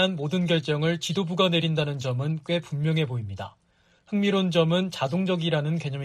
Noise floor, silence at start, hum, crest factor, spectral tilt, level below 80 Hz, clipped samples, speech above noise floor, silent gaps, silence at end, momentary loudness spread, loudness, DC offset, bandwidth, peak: -62 dBFS; 0 s; none; 18 dB; -6 dB/octave; -64 dBFS; under 0.1%; 37 dB; none; 0 s; 7 LU; -25 LUFS; under 0.1%; 11.5 kHz; -8 dBFS